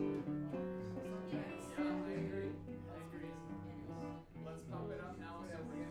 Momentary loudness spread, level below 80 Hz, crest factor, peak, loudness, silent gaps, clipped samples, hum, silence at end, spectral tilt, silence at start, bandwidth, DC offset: 9 LU; -66 dBFS; 16 dB; -28 dBFS; -45 LUFS; none; under 0.1%; none; 0 s; -7.5 dB/octave; 0 s; 13.5 kHz; under 0.1%